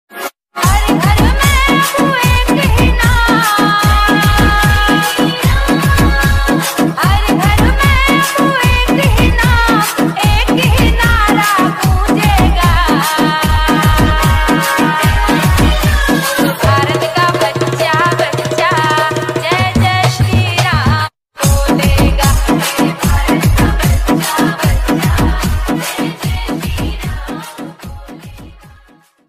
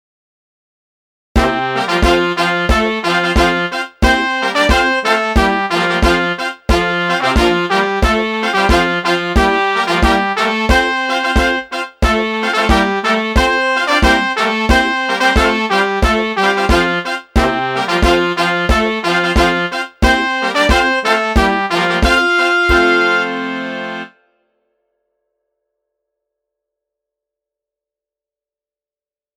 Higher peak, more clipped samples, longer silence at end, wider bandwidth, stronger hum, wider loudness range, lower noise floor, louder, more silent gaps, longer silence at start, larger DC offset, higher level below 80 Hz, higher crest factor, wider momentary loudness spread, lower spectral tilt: about the same, 0 dBFS vs 0 dBFS; neither; second, 0.75 s vs 5.3 s; about the same, 15.5 kHz vs 16.5 kHz; neither; about the same, 4 LU vs 2 LU; second, -46 dBFS vs under -90 dBFS; first, -11 LUFS vs -14 LUFS; neither; second, 0.15 s vs 1.35 s; neither; first, -18 dBFS vs -24 dBFS; about the same, 10 dB vs 14 dB; about the same, 6 LU vs 4 LU; about the same, -5 dB/octave vs -4.5 dB/octave